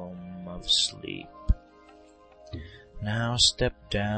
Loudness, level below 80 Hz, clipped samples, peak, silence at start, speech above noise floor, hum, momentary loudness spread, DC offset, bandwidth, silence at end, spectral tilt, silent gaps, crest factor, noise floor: -26 LUFS; -38 dBFS; under 0.1%; -8 dBFS; 0 s; 27 dB; none; 21 LU; under 0.1%; 8.8 kHz; 0 s; -3 dB/octave; none; 20 dB; -54 dBFS